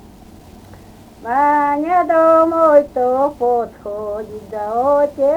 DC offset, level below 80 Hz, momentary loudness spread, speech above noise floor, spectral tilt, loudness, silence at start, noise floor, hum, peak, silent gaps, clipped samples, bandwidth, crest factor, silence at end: under 0.1%; -48 dBFS; 14 LU; 25 dB; -7 dB/octave; -15 LUFS; 0.7 s; -40 dBFS; none; 0 dBFS; none; under 0.1%; 16 kHz; 16 dB; 0 s